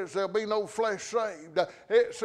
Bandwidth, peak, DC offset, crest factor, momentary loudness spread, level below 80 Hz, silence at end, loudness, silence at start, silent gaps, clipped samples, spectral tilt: 11 kHz; -12 dBFS; under 0.1%; 18 dB; 5 LU; -72 dBFS; 0 s; -29 LUFS; 0 s; none; under 0.1%; -3.5 dB/octave